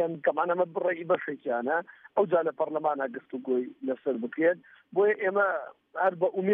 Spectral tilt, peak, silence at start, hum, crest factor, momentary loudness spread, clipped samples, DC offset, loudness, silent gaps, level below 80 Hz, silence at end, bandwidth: -5 dB/octave; -12 dBFS; 0 s; none; 16 dB; 7 LU; under 0.1%; under 0.1%; -29 LUFS; none; -86 dBFS; 0 s; 3.8 kHz